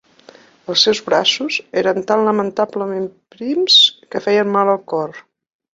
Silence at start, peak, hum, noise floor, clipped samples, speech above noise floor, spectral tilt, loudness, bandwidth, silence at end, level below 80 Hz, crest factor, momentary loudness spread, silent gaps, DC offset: 0.7 s; 0 dBFS; none; -46 dBFS; under 0.1%; 29 dB; -3 dB/octave; -15 LUFS; 7.8 kHz; 0.55 s; -64 dBFS; 18 dB; 14 LU; none; under 0.1%